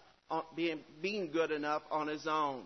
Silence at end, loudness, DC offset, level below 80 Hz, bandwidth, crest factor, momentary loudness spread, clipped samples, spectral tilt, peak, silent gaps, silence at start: 0 s; -36 LUFS; under 0.1%; -76 dBFS; 6.2 kHz; 16 dB; 6 LU; under 0.1%; -3 dB/octave; -22 dBFS; none; 0.3 s